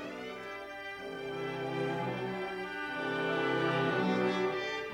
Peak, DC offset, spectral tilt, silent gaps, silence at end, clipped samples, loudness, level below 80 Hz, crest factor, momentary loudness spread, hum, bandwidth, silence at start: -20 dBFS; under 0.1%; -6 dB/octave; none; 0 s; under 0.1%; -34 LUFS; -68 dBFS; 16 dB; 11 LU; none; 16 kHz; 0 s